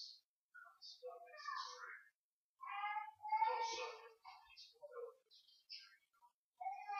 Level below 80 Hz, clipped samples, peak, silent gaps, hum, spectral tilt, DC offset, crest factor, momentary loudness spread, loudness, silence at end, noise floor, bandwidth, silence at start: under -90 dBFS; under 0.1%; -28 dBFS; 0.25-0.52 s, 2.15-2.56 s, 6.34-6.53 s; none; 1.5 dB/octave; under 0.1%; 22 dB; 23 LU; -47 LUFS; 0 s; under -90 dBFS; 7.4 kHz; 0 s